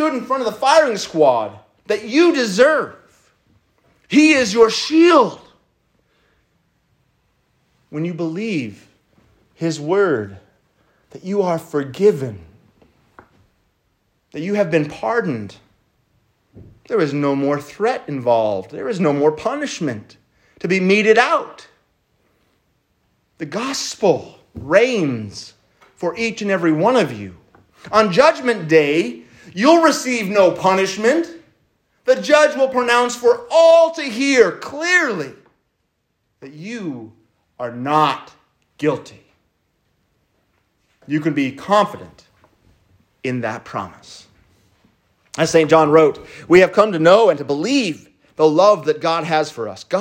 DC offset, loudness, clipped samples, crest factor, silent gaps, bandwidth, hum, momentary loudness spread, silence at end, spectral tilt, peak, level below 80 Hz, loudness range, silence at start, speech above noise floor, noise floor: under 0.1%; -16 LUFS; under 0.1%; 18 dB; none; 16 kHz; none; 17 LU; 0 s; -5 dB/octave; 0 dBFS; -62 dBFS; 10 LU; 0 s; 54 dB; -70 dBFS